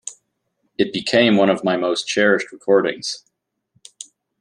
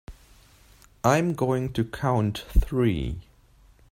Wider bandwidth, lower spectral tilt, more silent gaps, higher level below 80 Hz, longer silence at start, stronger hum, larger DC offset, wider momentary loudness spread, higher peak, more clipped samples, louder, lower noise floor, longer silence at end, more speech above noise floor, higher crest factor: second, 11 kHz vs 16 kHz; second, -4 dB/octave vs -6.5 dB/octave; neither; second, -66 dBFS vs -34 dBFS; about the same, 0.05 s vs 0.1 s; neither; neither; first, 23 LU vs 7 LU; first, -2 dBFS vs -6 dBFS; neither; first, -18 LUFS vs -26 LUFS; first, -71 dBFS vs -56 dBFS; first, 1.2 s vs 0.7 s; first, 53 dB vs 32 dB; about the same, 18 dB vs 20 dB